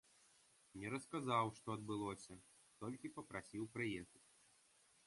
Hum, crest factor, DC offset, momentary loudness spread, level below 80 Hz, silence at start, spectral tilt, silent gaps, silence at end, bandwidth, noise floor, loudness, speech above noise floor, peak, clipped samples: none; 22 dB; under 0.1%; 16 LU; -76 dBFS; 0.75 s; -5.5 dB/octave; none; 0.9 s; 11.5 kHz; -74 dBFS; -46 LUFS; 28 dB; -26 dBFS; under 0.1%